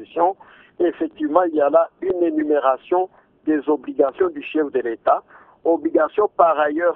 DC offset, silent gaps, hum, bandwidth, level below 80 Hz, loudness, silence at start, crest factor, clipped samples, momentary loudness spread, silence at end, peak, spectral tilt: under 0.1%; none; none; 3.9 kHz; -62 dBFS; -20 LUFS; 0 s; 18 dB; under 0.1%; 6 LU; 0 s; 0 dBFS; -9 dB/octave